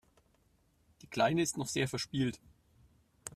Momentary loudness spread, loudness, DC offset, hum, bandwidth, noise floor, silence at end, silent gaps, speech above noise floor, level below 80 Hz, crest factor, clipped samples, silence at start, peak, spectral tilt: 15 LU; -34 LUFS; under 0.1%; none; 15.5 kHz; -71 dBFS; 0.05 s; none; 38 dB; -66 dBFS; 20 dB; under 0.1%; 1.1 s; -16 dBFS; -4.5 dB/octave